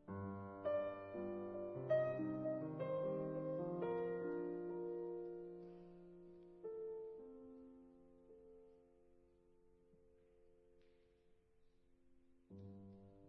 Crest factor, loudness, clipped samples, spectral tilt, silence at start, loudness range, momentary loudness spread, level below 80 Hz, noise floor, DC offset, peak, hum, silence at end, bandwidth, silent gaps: 20 dB; -45 LUFS; under 0.1%; -8 dB/octave; 0 s; 21 LU; 20 LU; -80 dBFS; -73 dBFS; under 0.1%; -28 dBFS; none; 0 s; 4.8 kHz; none